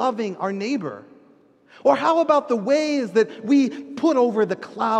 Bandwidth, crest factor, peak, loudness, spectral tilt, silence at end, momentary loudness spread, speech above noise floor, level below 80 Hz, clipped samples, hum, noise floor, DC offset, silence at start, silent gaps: 9 kHz; 16 dB; -4 dBFS; -21 LUFS; -5.5 dB/octave; 0 s; 8 LU; 34 dB; -74 dBFS; under 0.1%; none; -54 dBFS; under 0.1%; 0 s; none